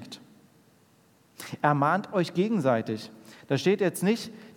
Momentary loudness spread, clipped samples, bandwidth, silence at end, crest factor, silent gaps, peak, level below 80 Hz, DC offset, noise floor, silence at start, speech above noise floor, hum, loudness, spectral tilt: 19 LU; under 0.1%; 18 kHz; 0.05 s; 20 dB; none; -8 dBFS; -80 dBFS; under 0.1%; -62 dBFS; 0 s; 36 dB; none; -27 LUFS; -6 dB/octave